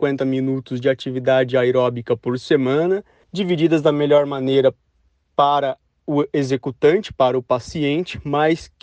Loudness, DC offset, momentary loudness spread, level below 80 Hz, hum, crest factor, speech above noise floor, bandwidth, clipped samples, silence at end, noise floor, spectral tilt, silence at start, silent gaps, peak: -19 LUFS; under 0.1%; 7 LU; -54 dBFS; none; 16 dB; 45 dB; 9 kHz; under 0.1%; 0.15 s; -63 dBFS; -7 dB/octave; 0 s; none; -4 dBFS